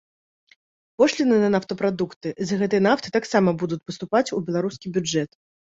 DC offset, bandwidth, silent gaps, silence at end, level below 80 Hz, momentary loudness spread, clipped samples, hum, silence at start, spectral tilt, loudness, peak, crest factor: under 0.1%; 8 kHz; 2.16-2.21 s; 0.5 s; -62 dBFS; 9 LU; under 0.1%; none; 1 s; -5.5 dB/octave; -23 LUFS; -4 dBFS; 18 dB